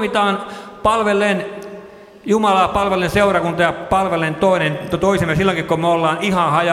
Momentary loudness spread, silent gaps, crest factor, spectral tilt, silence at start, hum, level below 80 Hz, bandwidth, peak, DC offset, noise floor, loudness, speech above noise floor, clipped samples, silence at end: 9 LU; none; 16 dB; -5.5 dB/octave; 0 s; none; -42 dBFS; 15.5 kHz; -2 dBFS; under 0.1%; -38 dBFS; -17 LUFS; 22 dB; under 0.1%; 0 s